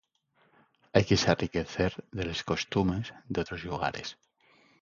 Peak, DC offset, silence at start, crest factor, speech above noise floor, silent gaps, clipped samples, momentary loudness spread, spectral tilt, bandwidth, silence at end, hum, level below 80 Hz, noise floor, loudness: -6 dBFS; under 0.1%; 0.95 s; 24 dB; 40 dB; none; under 0.1%; 11 LU; -5.5 dB/octave; 7.4 kHz; 0.7 s; none; -50 dBFS; -70 dBFS; -30 LUFS